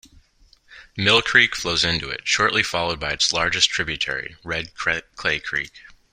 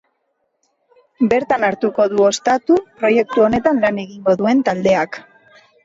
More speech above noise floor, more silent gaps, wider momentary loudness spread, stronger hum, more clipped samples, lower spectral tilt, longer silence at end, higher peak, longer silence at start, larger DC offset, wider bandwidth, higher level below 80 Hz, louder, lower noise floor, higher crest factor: second, 34 dB vs 53 dB; neither; first, 12 LU vs 5 LU; neither; neither; second, -2 dB/octave vs -5 dB/octave; second, 0.2 s vs 0.65 s; about the same, 0 dBFS vs -2 dBFS; second, 0.7 s vs 1.2 s; neither; first, 16 kHz vs 8 kHz; about the same, -48 dBFS vs -52 dBFS; second, -20 LUFS vs -16 LUFS; second, -56 dBFS vs -69 dBFS; first, 22 dB vs 16 dB